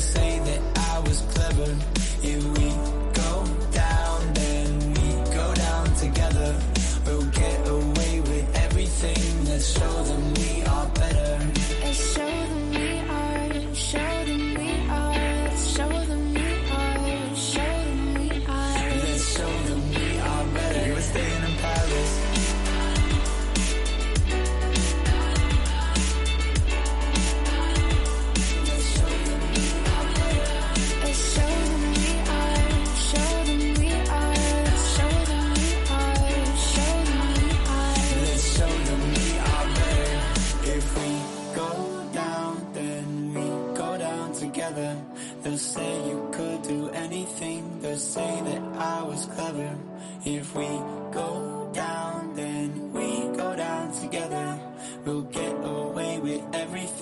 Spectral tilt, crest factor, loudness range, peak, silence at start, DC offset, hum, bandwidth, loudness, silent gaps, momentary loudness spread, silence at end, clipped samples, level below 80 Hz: -4.5 dB/octave; 12 dB; 7 LU; -12 dBFS; 0 s; under 0.1%; none; 11.5 kHz; -26 LUFS; none; 8 LU; 0 s; under 0.1%; -26 dBFS